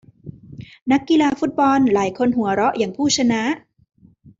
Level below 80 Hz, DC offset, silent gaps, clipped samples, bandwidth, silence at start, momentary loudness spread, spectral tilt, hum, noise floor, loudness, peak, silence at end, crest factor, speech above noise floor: -56 dBFS; under 0.1%; 0.82-0.86 s; under 0.1%; 7.8 kHz; 0.25 s; 14 LU; -4 dB/octave; none; -39 dBFS; -18 LUFS; -4 dBFS; 0.8 s; 16 dB; 22 dB